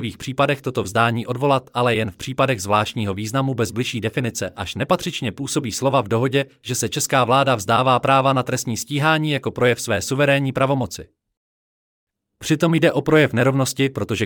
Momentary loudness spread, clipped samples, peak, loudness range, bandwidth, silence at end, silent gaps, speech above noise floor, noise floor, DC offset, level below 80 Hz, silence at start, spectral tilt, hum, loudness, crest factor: 8 LU; under 0.1%; -4 dBFS; 4 LU; 18.5 kHz; 0 s; 11.37-12.07 s; over 70 dB; under -90 dBFS; under 0.1%; -56 dBFS; 0 s; -5 dB/octave; none; -20 LUFS; 16 dB